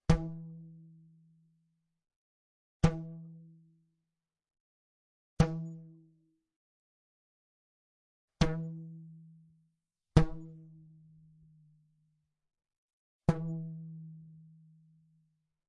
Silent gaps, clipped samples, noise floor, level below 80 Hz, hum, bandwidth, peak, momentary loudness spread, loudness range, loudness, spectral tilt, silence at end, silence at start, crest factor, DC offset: 2.16-2.80 s, 4.60-5.37 s, 6.56-8.28 s, 12.78-13.20 s; under 0.1%; -89 dBFS; -48 dBFS; none; 8.8 kHz; -6 dBFS; 25 LU; 5 LU; -34 LUFS; -7 dB/octave; 1.3 s; 0.1 s; 32 dB; under 0.1%